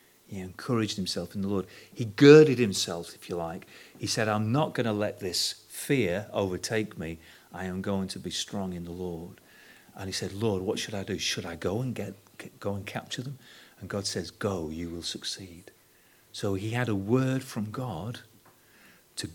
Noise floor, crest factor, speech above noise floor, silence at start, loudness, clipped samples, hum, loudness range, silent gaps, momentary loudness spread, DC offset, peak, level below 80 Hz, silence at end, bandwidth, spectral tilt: -61 dBFS; 26 dB; 32 dB; 0.3 s; -28 LUFS; under 0.1%; none; 12 LU; none; 15 LU; under 0.1%; -4 dBFS; -62 dBFS; 0 s; 18 kHz; -5 dB/octave